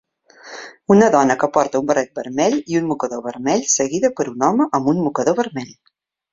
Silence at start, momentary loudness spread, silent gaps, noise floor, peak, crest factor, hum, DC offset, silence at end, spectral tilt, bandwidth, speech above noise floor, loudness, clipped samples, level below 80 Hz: 0.45 s; 15 LU; none; -43 dBFS; 0 dBFS; 18 dB; none; under 0.1%; 0.6 s; -4.5 dB/octave; 7.8 kHz; 26 dB; -18 LUFS; under 0.1%; -58 dBFS